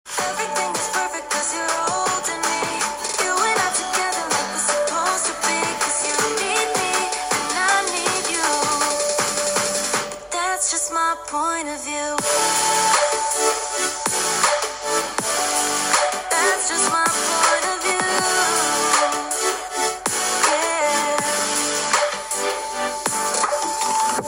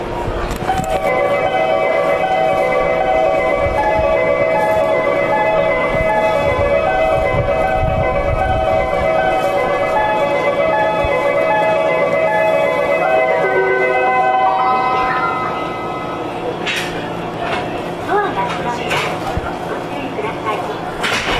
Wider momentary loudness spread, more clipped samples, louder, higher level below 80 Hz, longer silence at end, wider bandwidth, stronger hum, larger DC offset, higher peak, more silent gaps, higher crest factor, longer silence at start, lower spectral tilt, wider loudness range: second, 5 LU vs 8 LU; neither; second, -20 LUFS vs -16 LUFS; second, -56 dBFS vs -32 dBFS; about the same, 0 s vs 0 s; first, 17 kHz vs 14 kHz; neither; neither; about the same, -2 dBFS vs -4 dBFS; neither; first, 18 dB vs 12 dB; about the same, 0.05 s vs 0 s; second, -0.5 dB/octave vs -5.5 dB/octave; second, 3 LU vs 6 LU